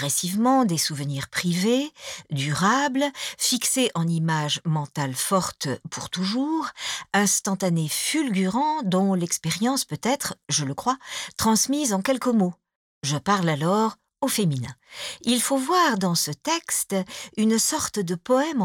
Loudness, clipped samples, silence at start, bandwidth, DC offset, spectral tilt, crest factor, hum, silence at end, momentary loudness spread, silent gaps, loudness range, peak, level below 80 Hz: -24 LUFS; under 0.1%; 0 s; 19 kHz; under 0.1%; -4 dB/octave; 16 dB; none; 0 s; 9 LU; 12.75-13.01 s; 2 LU; -8 dBFS; -62 dBFS